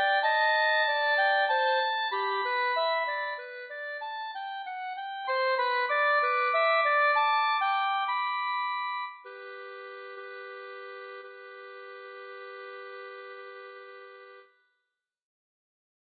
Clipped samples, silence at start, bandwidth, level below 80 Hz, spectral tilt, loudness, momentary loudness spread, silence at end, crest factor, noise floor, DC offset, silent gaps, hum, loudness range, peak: under 0.1%; 0 s; 4.8 kHz; under -90 dBFS; -2.5 dB/octave; -27 LUFS; 20 LU; 1.7 s; 16 dB; -84 dBFS; under 0.1%; none; none; 19 LU; -14 dBFS